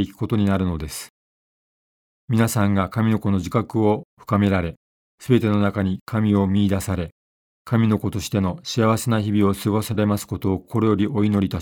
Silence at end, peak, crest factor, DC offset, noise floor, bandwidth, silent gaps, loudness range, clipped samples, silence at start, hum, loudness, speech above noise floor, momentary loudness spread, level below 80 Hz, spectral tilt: 0 s; -4 dBFS; 18 dB; under 0.1%; under -90 dBFS; 18 kHz; 1.10-2.28 s, 4.05-4.17 s, 4.77-5.18 s, 6.01-6.07 s, 7.12-7.65 s; 2 LU; under 0.1%; 0 s; none; -21 LUFS; over 70 dB; 7 LU; -46 dBFS; -6.5 dB/octave